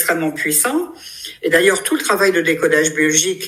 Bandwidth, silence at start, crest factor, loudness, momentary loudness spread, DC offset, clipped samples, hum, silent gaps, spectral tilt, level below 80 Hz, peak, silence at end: 16 kHz; 0 s; 16 dB; -15 LUFS; 11 LU; under 0.1%; under 0.1%; none; none; -2.5 dB/octave; -60 dBFS; 0 dBFS; 0 s